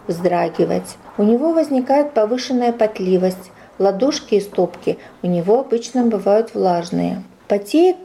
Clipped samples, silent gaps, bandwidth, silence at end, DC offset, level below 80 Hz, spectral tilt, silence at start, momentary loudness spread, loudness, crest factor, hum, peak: under 0.1%; none; 14 kHz; 0 s; under 0.1%; -58 dBFS; -6.5 dB/octave; 0.05 s; 7 LU; -18 LUFS; 12 dB; none; -4 dBFS